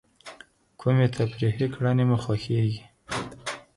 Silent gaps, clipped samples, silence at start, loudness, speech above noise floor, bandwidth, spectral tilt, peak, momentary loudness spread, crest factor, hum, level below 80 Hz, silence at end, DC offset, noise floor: none; under 0.1%; 0.25 s; -26 LUFS; 27 dB; 11.5 kHz; -7 dB/octave; -12 dBFS; 15 LU; 16 dB; none; -54 dBFS; 0.15 s; under 0.1%; -51 dBFS